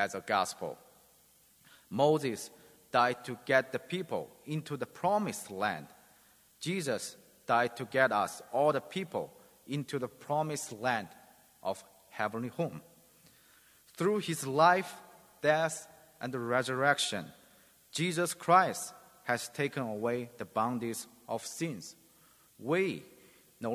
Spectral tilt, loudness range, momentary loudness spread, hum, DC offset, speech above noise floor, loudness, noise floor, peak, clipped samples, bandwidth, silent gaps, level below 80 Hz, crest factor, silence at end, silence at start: -4.5 dB/octave; 6 LU; 15 LU; none; under 0.1%; 32 dB; -33 LUFS; -64 dBFS; -10 dBFS; under 0.1%; 16 kHz; none; -76 dBFS; 24 dB; 0 s; 0 s